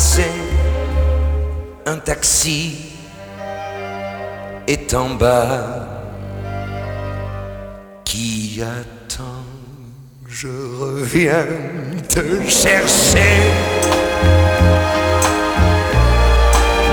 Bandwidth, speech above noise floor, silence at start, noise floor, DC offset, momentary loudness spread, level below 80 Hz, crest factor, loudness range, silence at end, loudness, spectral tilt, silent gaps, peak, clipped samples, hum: over 20 kHz; 22 dB; 0 s; -37 dBFS; under 0.1%; 18 LU; -22 dBFS; 16 dB; 12 LU; 0 s; -16 LUFS; -4 dB/octave; none; 0 dBFS; under 0.1%; none